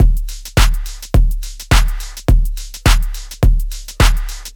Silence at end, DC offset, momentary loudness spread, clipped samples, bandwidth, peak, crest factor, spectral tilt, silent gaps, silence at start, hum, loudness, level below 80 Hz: 0.05 s; under 0.1%; 9 LU; under 0.1%; 18 kHz; 0 dBFS; 14 dB; -4.5 dB/octave; none; 0 s; none; -17 LUFS; -14 dBFS